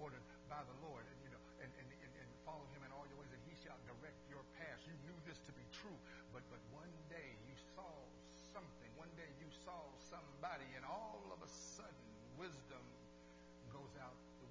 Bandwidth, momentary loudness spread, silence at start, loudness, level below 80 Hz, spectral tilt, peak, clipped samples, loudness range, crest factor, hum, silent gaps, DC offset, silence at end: 8 kHz; 8 LU; 0 s; -57 LUFS; -72 dBFS; -4.5 dB/octave; -36 dBFS; under 0.1%; 4 LU; 22 dB; none; none; under 0.1%; 0 s